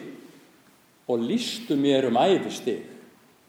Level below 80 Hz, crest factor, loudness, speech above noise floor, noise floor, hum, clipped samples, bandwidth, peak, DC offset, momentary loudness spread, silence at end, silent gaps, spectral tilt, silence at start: -78 dBFS; 18 dB; -25 LUFS; 34 dB; -58 dBFS; none; under 0.1%; 16.5 kHz; -8 dBFS; under 0.1%; 19 LU; 0.45 s; none; -5 dB/octave; 0 s